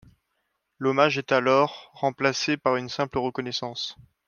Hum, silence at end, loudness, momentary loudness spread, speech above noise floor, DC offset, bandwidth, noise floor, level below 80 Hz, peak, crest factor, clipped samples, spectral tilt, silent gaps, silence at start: none; 0.35 s; -25 LUFS; 9 LU; 52 dB; under 0.1%; 7.2 kHz; -76 dBFS; -62 dBFS; -4 dBFS; 22 dB; under 0.1%; -4.5 dB/octave; none; 0.8 s